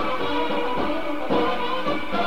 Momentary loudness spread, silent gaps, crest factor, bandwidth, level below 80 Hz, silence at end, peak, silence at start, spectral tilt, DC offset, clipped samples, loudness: 3 LU; none; 14 dB; 16 kHz; -48 dBFS; 0 s; -10 dBFS; 0 s; -5.5 dB/octave; 5%; under 0.1%; -25 LUFS